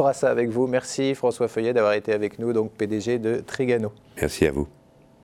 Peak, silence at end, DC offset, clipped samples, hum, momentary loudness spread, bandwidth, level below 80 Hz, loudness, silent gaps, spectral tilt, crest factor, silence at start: -4 dBFS; 0.55 s; under 0.1%; under 0.1%; none; 6 LU; 14.5 kHz; -48 dBFS; -24 LUFS; none; -5.5 dB/octave; 20 dB; 0 s